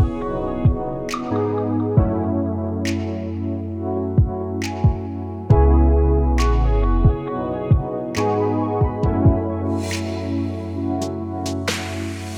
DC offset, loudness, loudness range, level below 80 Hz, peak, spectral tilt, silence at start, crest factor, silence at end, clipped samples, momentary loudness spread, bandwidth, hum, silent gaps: under 0.1%; -21 LUFS; 4 LU; -24 dBFS; -2 dBFS; -7 dB/octave; 0 s; 18 dB; 0 s; under 0.1%; 9 LU; 13.5 kHz; none; none